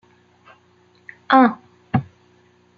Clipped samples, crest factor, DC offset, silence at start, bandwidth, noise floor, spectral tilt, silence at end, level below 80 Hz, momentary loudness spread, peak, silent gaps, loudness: under 0.1%; 20 dB; under 0.1%; 1.3 s; 5.6 kHz; -56 dBFS; -8.5 dB/octave; 0.75 s; -60 dBFS; 11 LU; -2 dBFS; none; -18 LUFS